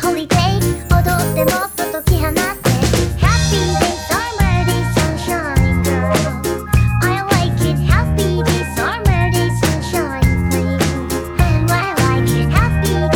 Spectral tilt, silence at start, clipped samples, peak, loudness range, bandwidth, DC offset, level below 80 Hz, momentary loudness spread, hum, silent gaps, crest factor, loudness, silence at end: -5.5 dB/octave; 0 s; under 0.1%; 0 dBFS; 1 LU; over 20 kHz; under 0.1%; -22 dBFS; 4 LU; none; none; 14 dB; -16 LUFS; 0 s